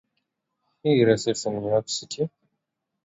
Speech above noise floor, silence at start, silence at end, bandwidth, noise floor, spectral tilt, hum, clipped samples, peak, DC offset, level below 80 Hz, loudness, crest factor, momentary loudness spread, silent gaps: 58 dB; 0.85 s; 0.75 s; 8 kHz; -81 dBFS; -5 dB/octave; none; under 0.1%; -6 dBFS; under 0.1%; -64 dBFS; -24 LUFS; 20 dB; 11 LU; none